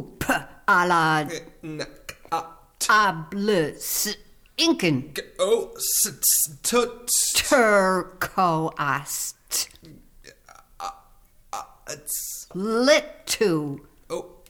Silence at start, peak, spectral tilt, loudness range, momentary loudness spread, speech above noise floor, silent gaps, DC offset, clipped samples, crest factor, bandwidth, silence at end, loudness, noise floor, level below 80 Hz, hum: 0 s; -6 dBFS; -2.5 dB/octave; 10 LU; 17 LU; 31 dB; none; under 0.1%; under 0.1%; 18 dB; over 20 kHz; 0.2 s; -22 LUFS; -54 dBFS; -54 dBFS; none